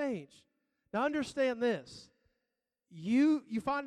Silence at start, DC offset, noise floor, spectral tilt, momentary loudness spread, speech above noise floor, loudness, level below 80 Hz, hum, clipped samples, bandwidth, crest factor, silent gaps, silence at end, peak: 0 s; under 0.1%; -88 dBFS; -5.5 dB/octave; 15 LU; 55 dB; -33 LUFS; -72 dBFS; none; under 0.1%; 11 kHz; 16 dB; none; 0 s; -18 dBFS